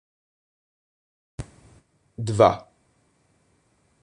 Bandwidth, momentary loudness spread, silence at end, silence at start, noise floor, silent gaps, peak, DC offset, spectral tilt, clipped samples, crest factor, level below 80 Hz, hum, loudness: 11 kHz; 25 LU; 1.4 s; 1.4 s; -65 dBFS; none; -2 dBFS; under 0.1%; -6.5 dB/octave; under 0.1%; 26 dB; -54 dBFS; none; -22 LUFS